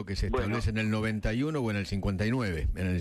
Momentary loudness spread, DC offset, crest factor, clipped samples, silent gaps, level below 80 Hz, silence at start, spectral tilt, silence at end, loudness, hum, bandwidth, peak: 2 LU; under 0.1%; 12 dB; under 0.1%; none; -38 dBFS; 0 s; -7 dB/octave; 0 s; -30 LUFS; none; 13.5 kHz; -16 dBFS